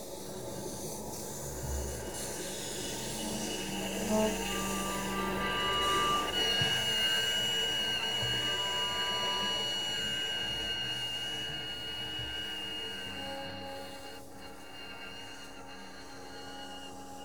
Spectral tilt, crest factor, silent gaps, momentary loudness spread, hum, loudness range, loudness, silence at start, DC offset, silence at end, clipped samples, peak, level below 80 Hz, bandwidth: -2 dB/octave; 18 dB; none; 17 LU; none; 13 LU; -32 LUFS; 0 s; 0.3%; 0 s; under 0.1%; -16 dBFS; -52 dBFS; over 20 kHz